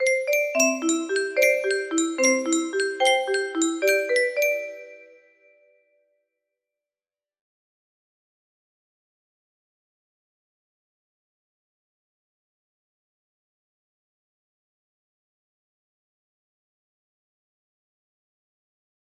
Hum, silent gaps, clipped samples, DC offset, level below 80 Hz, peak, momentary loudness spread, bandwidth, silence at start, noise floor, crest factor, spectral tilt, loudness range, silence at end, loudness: none; none; under 0.1%; under 0.1%; -78 dBFS; -6 dBFS; 5 LU; 15.5 kHz; 0 s; under -90 dBFS; 22 dB; 0 dB/octave; 7 LU; 13.95 s; -22 LUFS